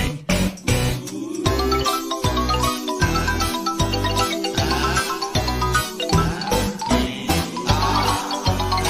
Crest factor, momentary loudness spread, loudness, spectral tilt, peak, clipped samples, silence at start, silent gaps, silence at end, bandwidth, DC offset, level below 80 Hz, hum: 18 dB; 3 LU; -21 LUFS; -4 dB/octave; -4 dBFS; under 0.1%; 0 s; none; 0 s; 16 kHz; under 0.1%; -30 dBFS; none